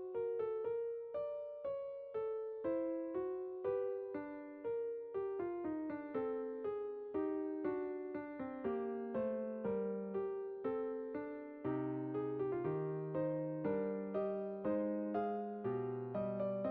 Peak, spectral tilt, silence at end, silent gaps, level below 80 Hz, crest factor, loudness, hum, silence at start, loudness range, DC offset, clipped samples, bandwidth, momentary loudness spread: -26 dBFS; -8.5 dB/octave; 0 s; none; -76 dBFS; 14 dB; -41 LUFS; none; 0 s; 2 LU; under 0.1%; under 0.1%; 4.5 kHz; 5 LU